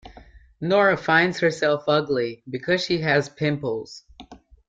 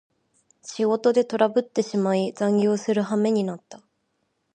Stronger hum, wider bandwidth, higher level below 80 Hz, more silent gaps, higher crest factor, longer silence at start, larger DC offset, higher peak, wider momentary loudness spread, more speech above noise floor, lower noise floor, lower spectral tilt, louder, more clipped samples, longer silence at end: neither; about the same, 9 kHz vs 9.4 kHz; first, -56 dBFS vs -76 dBFS; neither; about the same, 18 dB vs 18 dB; second, 0.05 s vs 0.65 s; neither; about the same, -6 dBFS vs -6 dBFS; first, 13 LU vs 9 LU; second, 26 dB vs 51 dB; second, -48 dBFS vs -73 dBFS; about the same, -5.5 dB/octave vs -6 dB/octave; about the same, -22 LUFS vs -23 LUFS; neither; second, 0.3 s vs 0.8 s